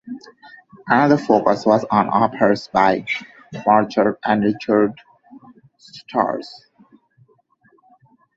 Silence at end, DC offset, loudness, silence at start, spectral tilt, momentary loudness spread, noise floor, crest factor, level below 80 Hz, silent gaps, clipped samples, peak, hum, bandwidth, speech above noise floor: 1.85 s; under 0.1%; -18 LUFS; 0.05 s; -7 dB/octave; 19 LU; -58 dBFS; 20 dB; -58 dBFS; none; under 0.1%; 0 dBFS; none; 7.8 kHz; 41 dB